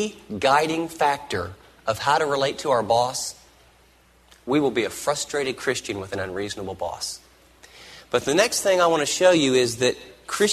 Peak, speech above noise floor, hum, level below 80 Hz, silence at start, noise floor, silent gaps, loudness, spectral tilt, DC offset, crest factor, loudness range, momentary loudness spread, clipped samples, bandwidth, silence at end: -4 dBFS; 34 dB; none; -56 dBFS; 0 s; -56 dBFS; none; -23 LUFS; -3 dB/octave; under 0.1%; 18 dB; 6 LU; 13 LU; under 0.1%; 13.5 kHz; 0 s